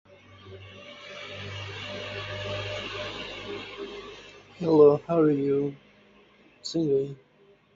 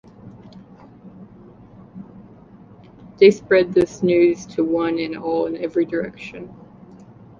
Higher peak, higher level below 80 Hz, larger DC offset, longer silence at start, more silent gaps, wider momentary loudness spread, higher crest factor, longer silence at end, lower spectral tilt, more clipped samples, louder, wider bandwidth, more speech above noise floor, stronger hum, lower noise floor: second, -8 dBFS vs -2 dBFS; about the same, -58 dBFS vs -56 dBFS; neither; second, 0.1 s vs 0.25 s; neither; about the same, 25 LU vs 26 LU; about the same, 22 dB vs 20 dB; second, 0.6 s vs 0.85 s; about the same, -6.5 dB/octave vs -6.5 dB/octave; neither; second, -27 LUFS vs -19 LUFS; about the same, 7.8 kHz vs 7.4 kHz; first, 37 dB vs 27 dB; neither; first, -60 dBFS vs -45 dBFS